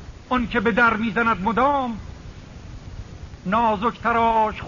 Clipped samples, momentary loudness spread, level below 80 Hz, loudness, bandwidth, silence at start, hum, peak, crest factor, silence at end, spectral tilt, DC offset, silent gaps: under 0.1%; 21 LU; -42 dBFS; -20 LUFS; 7.2 kHz; 0 s; none; -6 dBFS; 16 dB; 0 s; -4 dB/octave; 0.1%; none